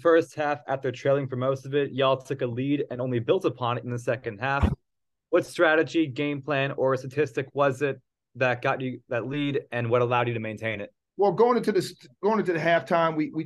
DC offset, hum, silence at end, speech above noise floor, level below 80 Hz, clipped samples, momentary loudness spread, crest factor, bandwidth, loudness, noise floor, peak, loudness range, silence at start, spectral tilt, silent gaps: under 0.1%; none; 0 s; 58 dB; -46 dBFS; under 0.1%; 8 LU; 18 dB; 12.5 kHz; -26 LUFS; -83 dBFS; -8 dBFS; 2 LU; 0 s; -6.5 dB/octave; none